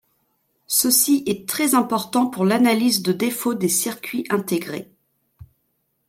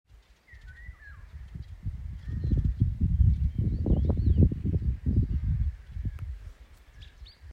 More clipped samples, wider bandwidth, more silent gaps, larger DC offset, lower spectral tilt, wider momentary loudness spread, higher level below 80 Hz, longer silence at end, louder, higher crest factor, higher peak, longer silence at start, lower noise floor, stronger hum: neither; first, 16.5 kHz vs 4.9 kHz; neither; neither; second, -3.5 dB/octave vs -10.5 dB/octave; second, 9 LU vs 23 LU; second, -64 dBFS vs -32 dBFS; first, 0.65 s vs 0 s; first, -19 LUFS vs -29 LUFS; about the same, 18 dB vs 18 dB; first, -4 dBFS vs -10 dBFS; first, 0.7 s vs 0.5 s; first, -71 dBFS vs -55 dBFS; neither